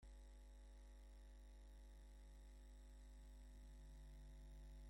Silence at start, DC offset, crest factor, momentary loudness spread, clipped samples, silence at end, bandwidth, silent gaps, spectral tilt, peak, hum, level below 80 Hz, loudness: 0 s; under 0.1%; 8 dB; 2 LU; under 0.1%; 0 s; 16.5 kHz; none; -5.5 dB/octave; -52 dBFS; 50 Hz at -60 dBFS; -60 dBFS; -65 LUFS